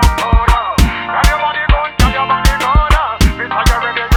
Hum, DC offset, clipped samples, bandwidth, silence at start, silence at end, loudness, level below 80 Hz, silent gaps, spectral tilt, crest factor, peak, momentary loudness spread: none; under 0.1%; under 0.1%; 17.5 kHz; 0 s; 0 s; -13 LUFS; -14 dBFS; none; -4.5 dB/octave; 12 dB; 0 dBFS; 3 LU